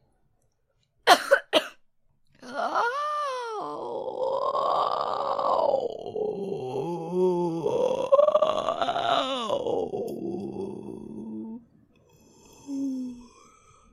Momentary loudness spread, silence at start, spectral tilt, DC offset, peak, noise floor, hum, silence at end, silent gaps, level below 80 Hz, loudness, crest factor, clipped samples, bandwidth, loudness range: 17 LU; 1.05 s; -4 dB/octave; under 0.1%; -2 dBFS; -71 dBFS; none; 0.65 s; none; -68 dBFS; -26 LUFS; 26 dB; under 0.1%; 15.5 kHz; 11 LU